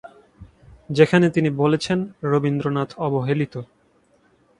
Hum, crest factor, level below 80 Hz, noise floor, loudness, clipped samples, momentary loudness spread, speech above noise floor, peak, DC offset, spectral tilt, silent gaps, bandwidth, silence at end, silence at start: none; 22 dB; -56 dBFS; -60 dBFS; -21 LUFS; under 0.1%; 9 LU; 40 dB; 0 dBFS; under 0.1%; -7 dB/octave; none; 11 kHz; 0.95 s; 0.05 s